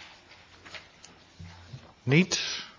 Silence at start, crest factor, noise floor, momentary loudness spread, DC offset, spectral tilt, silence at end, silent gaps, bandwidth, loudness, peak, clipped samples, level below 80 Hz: 0 s; 22 dB; -54 dBFS; 26 LU; under 0.1%; -4.5 dB/octave; 0.1 s; none; 7.6 kHz; -26 LUFS; -10 dBFS; under 0.1%; -60 dBFS